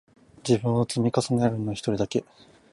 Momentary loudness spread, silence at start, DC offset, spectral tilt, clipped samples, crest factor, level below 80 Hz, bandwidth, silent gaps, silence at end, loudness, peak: 6 LU; 0.45 s; under 0.1%; -6.5 dB/octave; under 0.1%; 18 dB; -58 dBFS; 11.5 kHz; none; 0.5 s; -25 LUFS; -8 dBFS